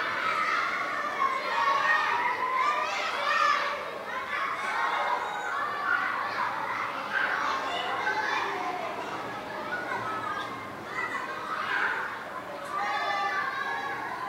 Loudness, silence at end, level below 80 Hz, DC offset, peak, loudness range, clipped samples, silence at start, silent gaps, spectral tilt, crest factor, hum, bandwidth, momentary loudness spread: -29 LUFS; 0 s; -70 dBFS; under 0.1%; -12 dBFS; 6 LU; under 0.1%; 0 s; none; -2.5 dB/octave; 18 dB; none; 16 kHz; 10 LU